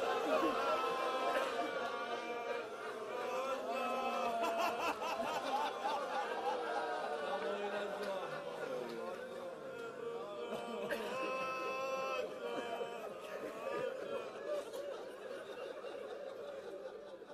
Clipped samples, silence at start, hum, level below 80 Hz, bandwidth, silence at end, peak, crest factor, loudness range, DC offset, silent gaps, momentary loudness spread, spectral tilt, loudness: under 0.1%; 0 s; none; -80 dBFS; 14.5 kHz; 0 s; -22 dBFS; 18 dB; 6 LU; under 0.1%; none; 11 LU; -3.5 dB/octave; -40 LUFS